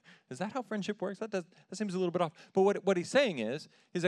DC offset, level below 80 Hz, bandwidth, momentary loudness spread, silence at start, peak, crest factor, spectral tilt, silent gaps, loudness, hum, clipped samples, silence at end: under 0.1%; under -90 dBFS; 11.5 kHz; 12 LU; 0.3 s; -12 dBFS; 20 dB; -5.5 dB/octave; none; -33 LUFS; none; under 0.1%; 0 s